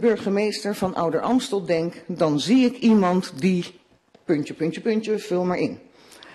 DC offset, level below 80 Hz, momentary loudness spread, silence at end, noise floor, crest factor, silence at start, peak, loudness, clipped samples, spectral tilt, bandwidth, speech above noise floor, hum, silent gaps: under 0.1%; -60 dBFS; 9 LU; 0.05 s; -57 dBFS; 14 dB; 0 s; -8 dBFS; -23 LUFS; under 0.1%; -6 dB/octave; 13 kHz; 35 dB; none; none